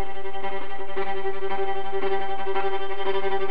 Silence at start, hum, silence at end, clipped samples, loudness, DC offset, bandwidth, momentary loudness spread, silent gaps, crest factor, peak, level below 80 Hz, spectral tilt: 0 s; none; 0 s; under 0.1%; -29 LUFS; 10%; 5.6 kHz; 6 LU; none; 14 dB; -10 dBFS; -52 dBFS; -8 dB/octave